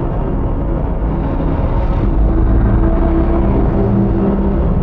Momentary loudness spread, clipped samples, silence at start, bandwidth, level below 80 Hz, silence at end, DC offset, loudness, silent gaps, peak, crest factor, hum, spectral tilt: 5 LU; under 0.1%; 0 s; 4 kHz; -16 dBFS; 0 s; under 0.1%; -16 LUFS; none; -2 dBFS; 12 dB; none; -12 dB/octave